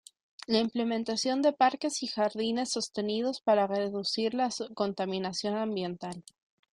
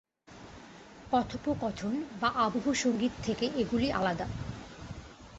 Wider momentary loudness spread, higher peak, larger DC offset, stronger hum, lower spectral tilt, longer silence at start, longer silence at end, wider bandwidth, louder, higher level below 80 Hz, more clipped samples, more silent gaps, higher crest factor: second, 6 LU vs 21 LU; about the same, -12 dBFS vs -12 dBFS; neither; neither; about the same, -4 dB/octave vs -5 dB/octave; first, 0.5 s vs 0.3 s; first, 0.55 s vs 0 s; first, 11 kHz vs 8.2 kHz; about the same, -30 LUFS vs -31 LUFS; second, -74 dBFS vs -52 dBFS; neither; neither; about the same, 18 dB vs 20 dB